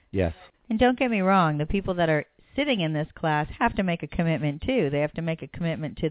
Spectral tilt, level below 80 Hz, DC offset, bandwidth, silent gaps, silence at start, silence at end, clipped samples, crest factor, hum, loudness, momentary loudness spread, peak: -10.5 dB/octave; -44 dBFS; under 0.1%; 4 kHz; none; 0.15 s; 0 s; under 0.1%; 18 dB; none; -26 LUFS; 9 LU; -6 dBFS